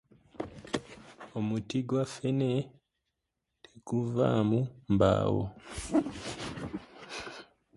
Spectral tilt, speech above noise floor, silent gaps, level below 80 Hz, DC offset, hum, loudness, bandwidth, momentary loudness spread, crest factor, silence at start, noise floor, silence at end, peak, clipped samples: -7 dB/octave; 55 dB; none; -54 dBFS; under 0.1%; none; -32 LUFS; 11.5 kHz; 17 LU; 20 dB; 0.35 s; -84 dBFS; 0.35 s; -12 dBFS; under 0.1%